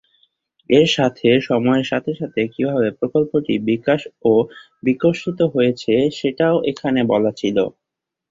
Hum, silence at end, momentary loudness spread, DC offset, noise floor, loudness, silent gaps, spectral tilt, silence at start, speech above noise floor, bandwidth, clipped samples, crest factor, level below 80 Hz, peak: none; 0.6 s; 7 LU; under 0.1%; -62 dBFS; -18 LUFS; none; -6.5 dB/octave; 0.7 s; 44 dB; 7.8 kHz; under 0.1%; 18 dB; -56 dBFS; -2 dBFS